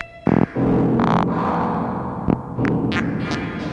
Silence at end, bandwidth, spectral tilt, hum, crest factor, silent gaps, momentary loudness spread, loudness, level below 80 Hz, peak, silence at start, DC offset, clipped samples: 0 s; 8.6 kHz; -8 dB/octave; none; 16 dB; none; 7 LU; -20 LUFS; -42 dBFS; -4 dBFS; 0 s; under 0.1%; under 0.1%